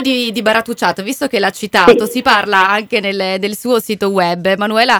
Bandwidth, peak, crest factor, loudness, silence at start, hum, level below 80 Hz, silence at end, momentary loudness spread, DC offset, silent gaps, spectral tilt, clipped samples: 19 kHz; 0 dBFS; 14 dB; -13 LUFS; 0 s; none; -50 dBFS; 0 s; 7 LU; under 0.1%; none; -4 dB/octave; 0.3%